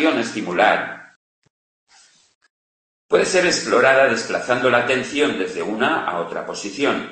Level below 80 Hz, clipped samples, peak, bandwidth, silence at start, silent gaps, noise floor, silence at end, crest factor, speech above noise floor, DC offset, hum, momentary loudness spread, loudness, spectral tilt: -60 dBFS; under 0.1%; -2 dBFS; 8.8 kHz; 0 s; 1.16-1.42 s, 1.50-1.87 s, 2.35-2.41 s, 2.50-3.09 s; under -90 dBFS; 0 s; 18 dB; over 71 dB; under 0.1%; none; 11 LU; -19 LUFS; -3.5 dB/octave